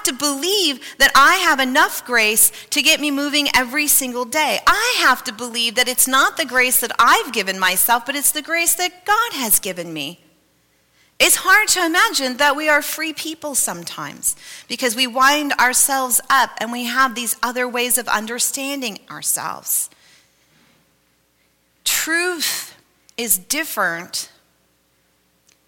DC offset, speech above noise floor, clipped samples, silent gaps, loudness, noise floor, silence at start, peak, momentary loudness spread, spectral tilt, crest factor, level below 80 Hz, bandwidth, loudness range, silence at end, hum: under 0.1%; 44 dB; under 0.1%; none; -16 LUFS; -62 dBFS; 0 s; -2 dBFS; 11 LU; 0 dB/octave; 18 dB; -52 dBFS; 17 kHz; 8 LU; 1.4 s; none